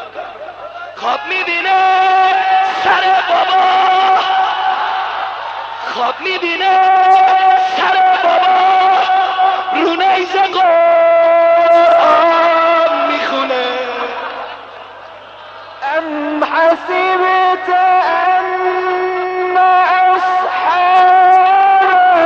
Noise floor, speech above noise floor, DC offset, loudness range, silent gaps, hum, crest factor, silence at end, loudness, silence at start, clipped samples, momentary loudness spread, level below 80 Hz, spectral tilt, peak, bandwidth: -33 dBFS; 22 dB; under 0.1%; 6 LU; none; none; 10 dB; 0 s; -11 LUFS; 0 s; under 0.1%; 13 LU; -62 dBFS; -3 dB/octave; -2 dBFS; 7 kHz